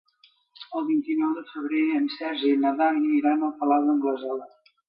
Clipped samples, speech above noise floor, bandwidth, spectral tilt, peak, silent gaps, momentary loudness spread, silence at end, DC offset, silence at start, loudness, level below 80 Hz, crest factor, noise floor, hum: under 0.1%; 38 dB; 5.2 kHz; -7.5 dB/octave; -10 dBFS; none; 9 LU; 0.4 s; under 0.1%; 0.6 s; -25 LUFS; -80 dBFS; 14 dB; -62 dBFS; none